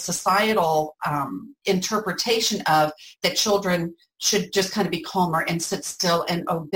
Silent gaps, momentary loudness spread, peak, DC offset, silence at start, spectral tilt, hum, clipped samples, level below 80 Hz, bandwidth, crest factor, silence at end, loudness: none; 6 LU; -8 dBFS; under 0.1%; 0 s; -3.5 dB/octave; none; under 0.1%; -60 dBFS; 17 kHz; 16 dB; 0 s; -23 LUFS